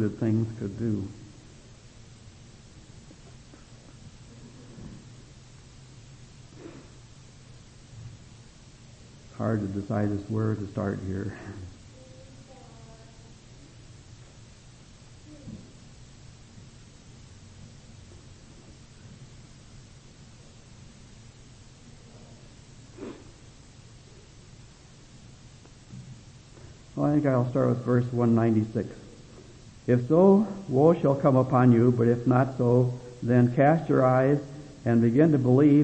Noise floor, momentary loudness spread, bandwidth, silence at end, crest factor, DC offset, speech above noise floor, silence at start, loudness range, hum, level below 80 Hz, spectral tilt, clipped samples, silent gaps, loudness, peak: -51 dBFS; 28 LU; 8.6 kHz; 0 s; 22 dB; under 0.1%; 28 dB; 0 s; 27 LU; none; -56 dBFS; -9 dB/octave; under 0.1%; none; -24 LUFS; -6 dBFS